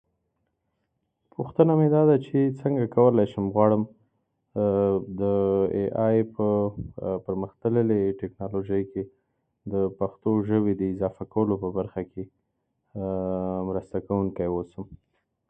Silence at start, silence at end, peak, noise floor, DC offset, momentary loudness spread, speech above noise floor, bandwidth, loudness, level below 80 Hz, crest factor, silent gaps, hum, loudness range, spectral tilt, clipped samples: 1.4 s; 0.55 s; -4 dBFS; -77 dBFS; under 0.1%; 15 LU; 52 dB; 3.8 kHz; -25 LUFS; -52 dBFS; 22 dB; none; none; 7 LU; -11.5 dB/octave; under 0.1%